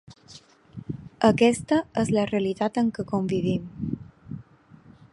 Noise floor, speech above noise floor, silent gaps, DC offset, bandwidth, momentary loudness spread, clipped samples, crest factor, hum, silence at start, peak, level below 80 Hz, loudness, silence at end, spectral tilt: -52 dBFS; 29 dB; none; under 0.1%; 11.5 kHz; 21 LU; under 0.1%; 22 dB; none; 0.1 s; -4 dBFS; -54 dBFS; -24 LUFS; 0.7 s; -6 dB/octave